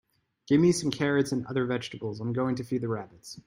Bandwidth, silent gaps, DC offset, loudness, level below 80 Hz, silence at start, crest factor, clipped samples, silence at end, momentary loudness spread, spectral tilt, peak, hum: 16 kHz; none; under 0.1%; -28 LUFS; -64 dBFS; 0.5 s; 16 dB; under 0.1%; 0.05 s; 12 LU; -6 dB/octave; -12 dBFS; none